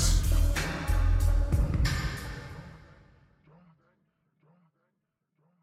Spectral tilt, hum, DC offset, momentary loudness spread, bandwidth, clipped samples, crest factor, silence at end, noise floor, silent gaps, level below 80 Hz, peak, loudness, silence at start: -4.5 dB/octave; none; under 0.1%; 16 LU; 15.5 kHz; under 0.1%; 16 dB; 2.85 s; -81 dBFS; none; -30 dBFS; -14 dBFS; -29 LUFS; 0 s